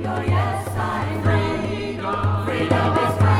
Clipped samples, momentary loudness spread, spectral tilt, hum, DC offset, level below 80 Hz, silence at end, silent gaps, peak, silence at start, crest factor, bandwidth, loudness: under 0.1%; 6 LU; -7 dB/octave; none; under 0.1%; -42 dBFS; 0 s; none; -4 dBFS; 0 s; 16 dB; 13 kHz; -22 LUFS